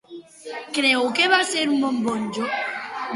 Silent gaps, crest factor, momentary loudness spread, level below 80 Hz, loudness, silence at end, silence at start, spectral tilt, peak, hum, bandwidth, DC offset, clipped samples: none; 20 dB; 14 LU; -68 dBFS; -21 LUFS; 0 s; 0.1 s; -2.5 dB/octave; -4 dBFS; none; 11.5 kHz; under 0.1%; under 0.1%